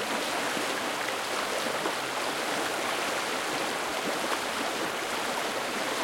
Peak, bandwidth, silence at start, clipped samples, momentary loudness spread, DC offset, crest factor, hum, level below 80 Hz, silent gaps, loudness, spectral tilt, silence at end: -14 dBFS; 16.5 kHz; 0 s; under 0.1%; 1 LU; under 0.1%; 18 dB; none; -68 dBFS; none; -29 LUFS; -1.5 dB/octave; 0 s